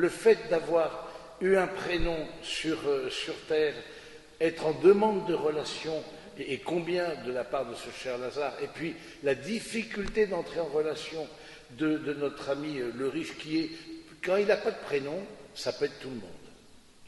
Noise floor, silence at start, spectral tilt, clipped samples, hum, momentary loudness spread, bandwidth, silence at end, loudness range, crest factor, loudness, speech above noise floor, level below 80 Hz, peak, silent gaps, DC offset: -55 dBFS; 0 s; -5 dB/octave; under 0.1%; none; 15 LU; 11.5 kHz; 0 s; 5 LU; 22 dB; -30 LUFS; 25 dB; -50 dBFS; -10 dBFS; none; under 0.1%